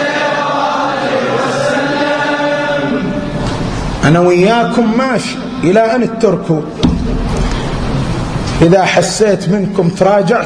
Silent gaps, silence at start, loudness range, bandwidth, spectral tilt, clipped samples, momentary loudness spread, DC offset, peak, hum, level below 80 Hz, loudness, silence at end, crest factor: none; 0 s; 2 LU; 10.5 kHz; -5.5 dB/octave; under 0.1%; 8 LU; under 0.1%; 0 dBFS; none; -26 dBFS; -13 LUFS; 0 s; 12 dB